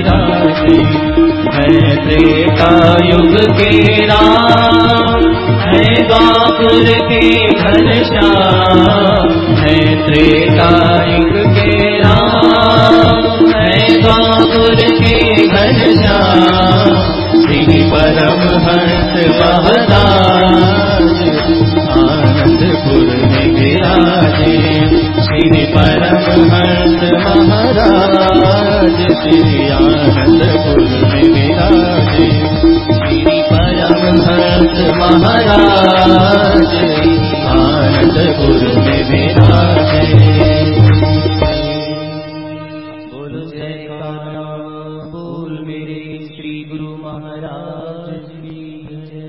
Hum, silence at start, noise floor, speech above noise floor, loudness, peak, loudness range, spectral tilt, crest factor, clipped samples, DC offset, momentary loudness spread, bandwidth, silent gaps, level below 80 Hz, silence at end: none; 0 s; -29 dBFS; 21 dB; -9 LUFS; 0 dBFS; 15 LU; -8 dB/octave; 8 dB; 0.4%; 0.3%; 18 LU; 8 kHz; none; -24 dBFS; 0 s